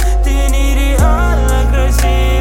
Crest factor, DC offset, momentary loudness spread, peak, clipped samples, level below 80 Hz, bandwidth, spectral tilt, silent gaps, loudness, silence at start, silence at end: 10 dB; under 0.1%; 2 LU; 0 dBFS; under 0.1%; -10 dBFS; 16.5 kHz; -5.5 dB/octave; none; -13 LUFS; 0 s; 0 s